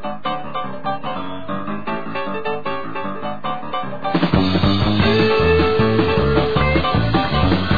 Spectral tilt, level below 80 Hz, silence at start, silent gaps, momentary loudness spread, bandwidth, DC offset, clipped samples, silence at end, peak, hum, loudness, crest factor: -8.5 dB/octave; -32 dBFS; 0 s; none; 11 LU; 5 kHz; 4%; under 0.1%; 0 s; 0 dBFS; none; -19 LUFS; 18 dB